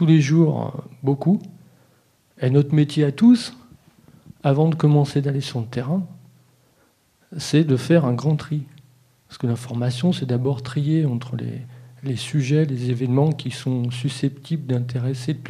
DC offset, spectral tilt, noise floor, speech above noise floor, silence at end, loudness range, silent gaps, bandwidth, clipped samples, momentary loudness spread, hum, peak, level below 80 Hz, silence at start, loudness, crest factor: under 0.1%; -7.5 dB/octave; -61 dBFS; 41 dB; 0 s; 4 LU; none; 11.5 kHz; under 0.1%; 12 LU; none; -4 dBFS; -62 dBFS; 0 s; -21 LUFS; 18 dB